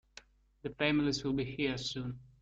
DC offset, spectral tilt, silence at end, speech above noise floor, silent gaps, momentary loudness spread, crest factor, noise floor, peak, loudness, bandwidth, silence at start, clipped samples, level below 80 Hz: under 0.1%; -5 dB/octave; 0.15 s; 25 dB; none; 14 LU; 20 dB; -59 dBFS; -16 dBFS; -34 LUFS; 8 kHz; 0.65 s; under 0.1%; -58 dBFS